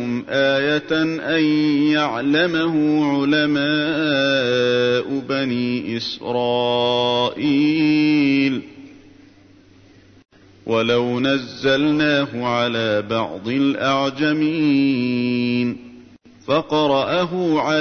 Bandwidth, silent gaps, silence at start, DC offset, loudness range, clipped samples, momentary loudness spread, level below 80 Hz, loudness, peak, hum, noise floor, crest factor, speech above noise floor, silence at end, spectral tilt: 6.6 kHz; none; 0 s; under 0.1%; 4 LU; under 0.1%; 6 LU; -58 dBFS; -19 LUFS; -6 dBFS; none; -49 dBFS; 14 dB; 31 dB; 0 s; -6 dB/octave